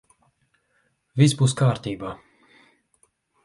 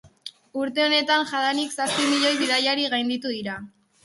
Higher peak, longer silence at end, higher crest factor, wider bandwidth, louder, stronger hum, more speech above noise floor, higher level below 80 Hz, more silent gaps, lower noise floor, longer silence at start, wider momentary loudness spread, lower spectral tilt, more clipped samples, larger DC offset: first, -4 dBFS vs -8 dBFS; first, 1.3 s vs 0.35 s; about the same, 20 dB vs 16 dB; about the same, 11.5 kHz vs 12 kHz; about the same, -22 LUFS vs -22 LUFS; neither; first, 48 dB vs 21 dB; first, -58 dBFS vs -68 dBFS; neither; first, -69 dBFS vs -44 dBFS; first, 1.15 s vs 0.05 s; first, 17 LU vs 14 LU; first, -6 dB/octave vs -2 dB/octave; neither; neither